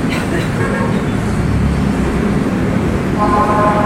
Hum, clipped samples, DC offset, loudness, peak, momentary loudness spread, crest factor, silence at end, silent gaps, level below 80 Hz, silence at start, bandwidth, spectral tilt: none; under 0.1%; under 0.1%; -15 LUFS; 0 dBFS; 4 LU; 14 dB; 0 s; none; -26 dBFS; 0 s; 15.5 kHz; -7 dB/octave